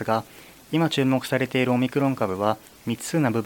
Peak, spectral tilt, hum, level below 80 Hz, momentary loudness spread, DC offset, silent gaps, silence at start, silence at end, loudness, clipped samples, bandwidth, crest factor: -6 dBFS; -6 dB/octave; none; -62 dBFS; 8 LU; under 0.1%; none; 0 s; 0 s; -24 LUFS; under 0.1%; 17.5 kHz; 18 dB